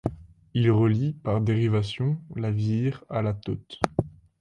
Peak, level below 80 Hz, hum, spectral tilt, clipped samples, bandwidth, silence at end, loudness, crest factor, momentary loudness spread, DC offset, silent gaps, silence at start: 0 dBFS; -50 dBFS; none; -8 dB/octave; under 0.1%; 11 kHz; 0.3 s; -26 LUFS; 24 dB; 10 LU; under 0.1%; none; 0.05 s